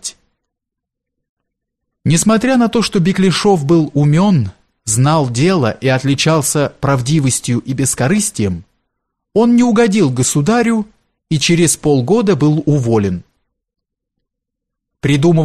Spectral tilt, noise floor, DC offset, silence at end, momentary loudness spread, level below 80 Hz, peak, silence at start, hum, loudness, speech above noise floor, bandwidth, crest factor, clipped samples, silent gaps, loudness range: -5 dB/octave; -80 dBFS; under 0.1%; 0 s; 8 LU; -44 dBFS; 0 dBFS; 0.05 s; none; -13 LUFS; 67 dB; 13 kHz; 14 dB; under 0.1%; 1.29-1.37 s; 3 LU